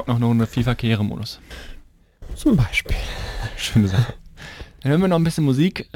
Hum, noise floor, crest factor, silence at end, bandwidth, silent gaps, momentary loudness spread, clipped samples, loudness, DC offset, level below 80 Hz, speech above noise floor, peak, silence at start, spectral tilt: none; -42 dBFS; 14 dB; 0.1 s; 16.5 kHz; none; 20 LU; under 0.1%; -21 LUFS; under 0.1%; -34 dBFS; 23 dB; -6 dBFS; 0 s; -6.5 dB/octave